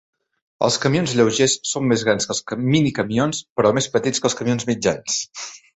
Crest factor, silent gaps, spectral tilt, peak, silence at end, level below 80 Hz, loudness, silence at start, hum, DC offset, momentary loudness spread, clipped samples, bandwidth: 18 dB; 3.50-3.56 s; -4 dB/octave; -2 dBFS; 0.2 s; -54 dBFS; -20 LUFS; 0.6 s; none; under 0.1%; 5 LU; under 0.1%; 8.4 kHz